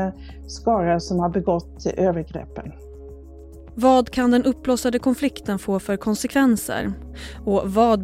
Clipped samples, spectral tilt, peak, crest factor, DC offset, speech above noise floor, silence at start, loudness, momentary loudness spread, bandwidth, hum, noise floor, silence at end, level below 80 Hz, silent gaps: under 0.1%; -6 dB/octave; -4 dBFS; 18 dB; under 0.1%; 20 dB; 0 s; -21 LUFS; 19 LU; 15.5 kHz; none; -41 dBFS; 0 s; -42 dBFS; none